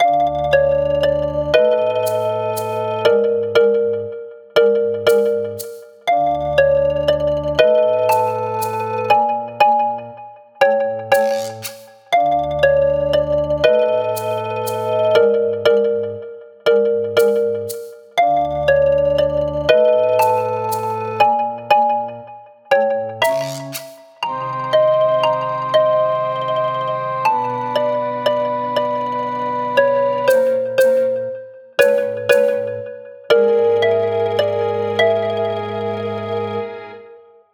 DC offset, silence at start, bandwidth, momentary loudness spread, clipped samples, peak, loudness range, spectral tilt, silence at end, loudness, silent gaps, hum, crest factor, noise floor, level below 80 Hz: under 0.1%; 0 s; over 20 kHz; 10 LU; under 0.1%; 0 dBFS; 2 LU; -4.5 dB/octave; 0.35 s; -17 LUFS; none; none; 16 dB; -43 dBFS; -46 dBFS